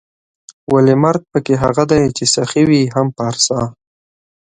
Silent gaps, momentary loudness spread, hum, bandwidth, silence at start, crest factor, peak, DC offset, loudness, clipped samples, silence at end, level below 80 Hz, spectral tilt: none; 7 LU; none; 9.6 kHz; 0.7 s; 14 dB; 0 dBFS; under 0.1%; -14 LUFS; under 0.1%; 0.7 s; -44 dBFS; -5 dB/octave